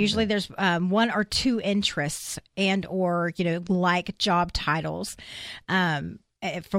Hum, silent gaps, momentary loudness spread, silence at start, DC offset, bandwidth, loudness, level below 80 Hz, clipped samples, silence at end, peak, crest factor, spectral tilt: none; none; 11 LU; 0 s; under 0.1%; 16 kHz; -25 LUFS; -48 dBFS; under 0.1%; 0 s; -8 dBFS; 18 dB; -4.5 dB/octave